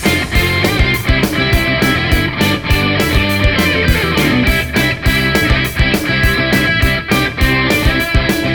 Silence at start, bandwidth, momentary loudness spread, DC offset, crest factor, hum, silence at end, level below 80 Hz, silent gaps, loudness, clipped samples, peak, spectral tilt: 0 s; over 20 kHz; 2 LU; 0.5%; 12 dB; none; 0 s; -20 dBFS; none; -13 LUFS; under 0.1%; 0 dBFS; -5 dB/octave